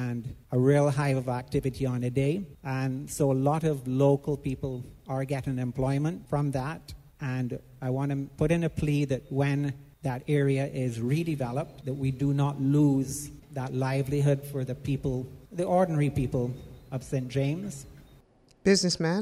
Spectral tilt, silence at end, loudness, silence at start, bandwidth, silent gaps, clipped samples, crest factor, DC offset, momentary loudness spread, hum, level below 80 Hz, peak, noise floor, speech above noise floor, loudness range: -6.5 dB/octave; 0 s; -29 LUFS; 0 s; 14 kHz; none; under 0.1%; 20 dB; under 0.1%; 11 LU; none; -50 dBFS; -8 dBFS; -60 dBFS; 32 dB; 3 LU